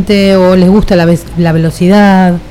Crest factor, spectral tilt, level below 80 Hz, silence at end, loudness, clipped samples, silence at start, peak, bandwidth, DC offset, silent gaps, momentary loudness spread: 6 dB; -7 dB/octave; -24 dBFS; 0 s; -7 LUFS; 0.3%; 0 s; 0 dBFS; 13.5 kHz; under 0.1%; none; 5 LU